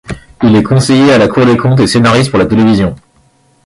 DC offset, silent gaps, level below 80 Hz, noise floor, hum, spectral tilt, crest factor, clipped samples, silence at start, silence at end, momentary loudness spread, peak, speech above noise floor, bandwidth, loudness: under 0.1%; none; -34 dBFS; -49 dBFS; none; -6 dB/octave; 8 dB; under 0.1%; 0.1 s; 0.7 s; 6 LU; 0 dBFS; 42 dB; 11.5 kHz; -8 LUFS